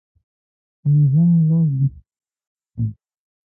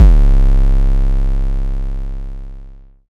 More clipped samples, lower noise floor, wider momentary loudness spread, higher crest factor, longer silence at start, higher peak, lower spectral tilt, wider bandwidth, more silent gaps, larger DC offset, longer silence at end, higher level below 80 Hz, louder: neither; first, under -90 dBFS vs -35 dBFS; second, 12 LU vs 18 LU; about the same, 12 dB vs 12 dB; first, 0.85 s vs 0 s; second, -8 dBFS vs 0 dBFS; first, -17.5 dB/octave vs -9 dB/octave; second, 1 kHz vs 2.8 kHz; first, 2.47-2.55 s vs none; neither; first, 0.6 s vs 0.45 s; second, -50 dBFS vs -12 dBFS; about the same, -18 LUFS vs -17 LUFS